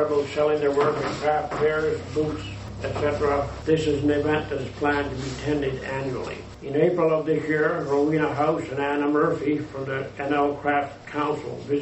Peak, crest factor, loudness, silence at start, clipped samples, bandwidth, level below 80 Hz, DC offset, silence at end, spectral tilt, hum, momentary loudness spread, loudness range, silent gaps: -8 dBFS; 16 dB; -24 LUFS; 0 s; under 0.1%; 8.2 kHz; -46 dBFS; under 0.1%; 0 s; -6.5 dB/octave; none; 8 LU; 2 LU; none